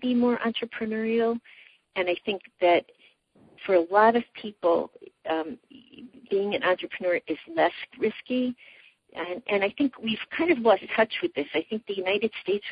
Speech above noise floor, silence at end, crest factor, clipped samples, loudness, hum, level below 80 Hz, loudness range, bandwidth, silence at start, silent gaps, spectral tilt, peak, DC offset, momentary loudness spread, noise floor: 33 dB; 0 s; 20 dB; under 0.1%; -26 LUFS; none; -68 dBFS; 3 LU; 5 kHz; 0 s; none; -8 dB/octave; -8 dBFS; under 0.1%; 12 LU; -60 dBFS